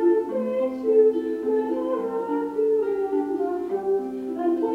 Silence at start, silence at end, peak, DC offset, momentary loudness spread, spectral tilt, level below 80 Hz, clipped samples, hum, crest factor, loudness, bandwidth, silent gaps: 0 s; 0 s; -8 dBFS; under 0.1%; 7 LU; -7.5 dB/octave; -66 dBFS; under 0.1%; none; 14 dB; -24 LUFS; 5.2 kHz; none